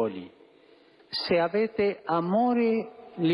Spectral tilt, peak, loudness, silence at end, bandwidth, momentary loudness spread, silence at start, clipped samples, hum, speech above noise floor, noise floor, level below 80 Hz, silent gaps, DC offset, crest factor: -8 dB/octave; -14 dBFS; -27 LUFS; 0 s; 11.5 kHz; 10 LU; 0 s; under 0.1%; none; 31 dB; -57 dBFS; -66 dBFS; none; under 0.1%; 14 dB